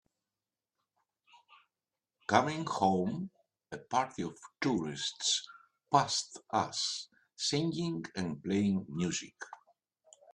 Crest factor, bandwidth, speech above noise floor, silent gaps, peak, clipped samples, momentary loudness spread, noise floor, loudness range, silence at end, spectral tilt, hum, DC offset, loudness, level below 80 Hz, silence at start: 26 dB; 11 kHz; over 57 dB; none; -8 dBFS; under 0.1%; 16 LU; under -90 dBFS; 2 LU; 0.8 s; -4 dB/octave; none; under 0.1%; -33 LUFS; -72 dBFS; 2.3 s